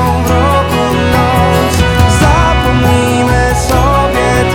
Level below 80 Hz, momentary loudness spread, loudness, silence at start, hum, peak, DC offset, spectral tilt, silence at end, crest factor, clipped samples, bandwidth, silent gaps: -18 dBFS; 2 LU; -10 LUFS; 0 s; none; 0 dBFS; under 0.1%; -5.5 dB/octave; 0 s; 10 dB; under 0.1%; 20 kHz; none